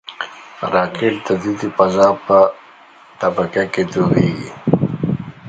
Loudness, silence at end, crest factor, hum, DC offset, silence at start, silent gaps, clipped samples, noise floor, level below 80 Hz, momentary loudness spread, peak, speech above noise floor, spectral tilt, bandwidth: -17 LUFS; 0 s; 16 dB; none; under 0.1%; 0.1 s; none; under 0.1%; -44 dBFS; -50 dBFS; 10 LU; 0 dBFS; 29 dB; -7 dB/octave; 9 kHz